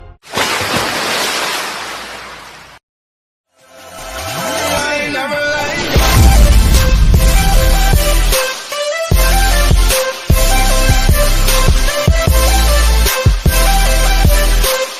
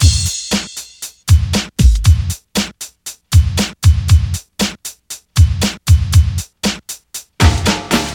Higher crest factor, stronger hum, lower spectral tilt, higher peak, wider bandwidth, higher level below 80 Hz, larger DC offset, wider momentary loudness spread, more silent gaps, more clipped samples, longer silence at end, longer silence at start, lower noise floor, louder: about the same, 12 dB vs 14 dB; neither; about the same, -3.5 dB/octave vs -4.5 dB/octave; about the same, 0 dBFS vs 0 dBFS; second, 15.5 kHz vs 18 kHz; about the same, -14 dBFS vs -18 dBFS; neither; second, 9 LU vs 15 LU; first, 2.83-3.44 s vs none; neither; about the same, 0 s vs 0 s; about the same, 0.05 s vs 0 s; first, -38 dBFS vs -32 dBFS; about the same, -13 LUFS vs -15 LUFS